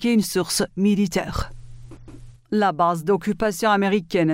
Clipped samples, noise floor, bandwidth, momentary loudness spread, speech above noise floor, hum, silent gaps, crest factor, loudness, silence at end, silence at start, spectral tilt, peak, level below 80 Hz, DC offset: under 0.1%; -42 dBFS; 16 kHz; 7 LU; 21 dB; none; none; 14 dB; -21 LUFS; 0 s; 0 s; -5 dB/octave; -6 dBFS; -42 dBFS; under 0.1%